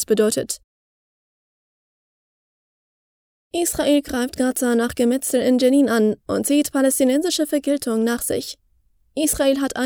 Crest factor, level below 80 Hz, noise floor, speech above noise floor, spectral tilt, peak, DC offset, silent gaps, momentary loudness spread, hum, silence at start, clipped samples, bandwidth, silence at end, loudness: 16 dB; -50 dBFS; -61 dBFS; 42 dB; -3.5 dB/octave; -6 dBFS; under 0.1%; 0.64-3.51 s; 9 LU; none; 0 s; under 0.1%; over 20 kHz; 0 s; -19 LUFS